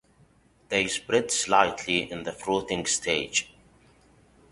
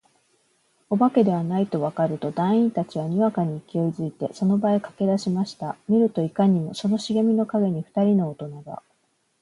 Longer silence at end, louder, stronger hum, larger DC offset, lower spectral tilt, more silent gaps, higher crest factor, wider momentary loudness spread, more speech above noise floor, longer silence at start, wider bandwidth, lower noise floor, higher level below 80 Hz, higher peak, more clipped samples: first, 1.05 s vs 0.65 s; second, -26 LUFS vs -23 LUFS; neither; neither; second, -2 dB/octave vs -8 dB/octave; neither; first, 24 dB vs 18 dB; about the same, 7 LU vs 9 LU; second, 34 dB vs 46 dB; second, 0.7 s vs 0.9 s; about the same, 11.5 kHz vs 11 kHz; second, -60 dBFS vs -69 dBFS; first, -58 dBFS vs -68 dBFS; about the same, -4 dBFS vs -6 dBFS; neither